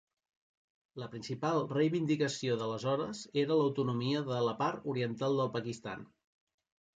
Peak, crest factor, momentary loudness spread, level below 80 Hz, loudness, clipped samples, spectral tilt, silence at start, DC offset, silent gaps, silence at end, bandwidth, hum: -18 dBFS; 16 dB; 13 LU; -74 dBFS; -34 LUFS; under 0.1%; -6 dB/octave; 0.95 s; under 0.1%; none; 0.9 s; 9.4 kHz; none